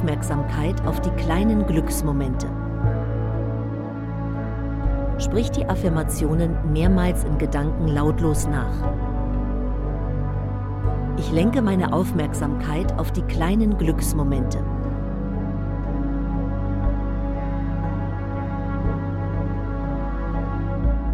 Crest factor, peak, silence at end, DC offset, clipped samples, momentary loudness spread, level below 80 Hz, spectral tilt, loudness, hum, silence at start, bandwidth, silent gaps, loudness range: 16 dB; -6 dBFS; 0 s; under 0.1%; under 0.1%; 7 LU; -26 dBFS; -7 dB/octave; -24 LUFS; none; 0 s; 15 kHz; none; 4 LU